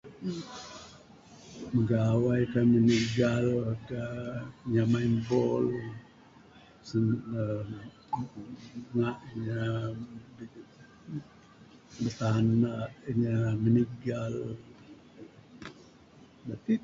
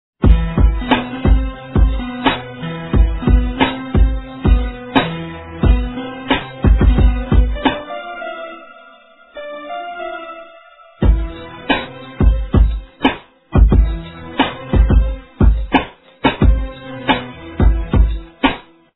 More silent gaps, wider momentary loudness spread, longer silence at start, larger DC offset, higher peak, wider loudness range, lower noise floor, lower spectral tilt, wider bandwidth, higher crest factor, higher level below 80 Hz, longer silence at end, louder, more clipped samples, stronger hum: neither; first, 21 LU vs 15 LU; second, 0.05 s vs 0.2 s; neither; second, -14 dBFS vs 0 dBFS; first, 9 LU vs 6 LU; first, -56 dBFS vs -45 dBFS; second, -7.5 dB/octave vs -10 dB/octave; first, 7.6 kHz vs 4.1 kHz; about the same, 16 dB vs 16 dB; second, -58 dBFS vs -18 dBFS; second, 0 s vs 0.35 s; second, -30 LUFS vs -17 LUFS; neither; neither